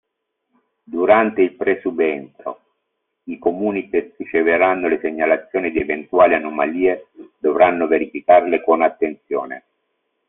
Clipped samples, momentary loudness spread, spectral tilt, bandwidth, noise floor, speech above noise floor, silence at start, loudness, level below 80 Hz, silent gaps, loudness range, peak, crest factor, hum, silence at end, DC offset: under 0.1%; 13 LU; -4 dB/octave; 3.9 kHz; -75 dBFS; 58 dB; 0.9 s; -18 LUFS; -56 dBFS; none; 4 LU; -2 dBFS; 18 dB; none; 0.7 s; under 0.1%